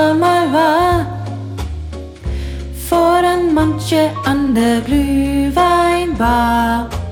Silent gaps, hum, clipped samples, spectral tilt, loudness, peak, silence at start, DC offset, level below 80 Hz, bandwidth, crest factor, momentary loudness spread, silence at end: none; none; under 0.1%; -6 dB/octave; -15 LUFS; -2 dBFS; 0 s; under 0.1%; -28 dBFS; 17.5 kHz; 12 dB; 13 LU; 0 s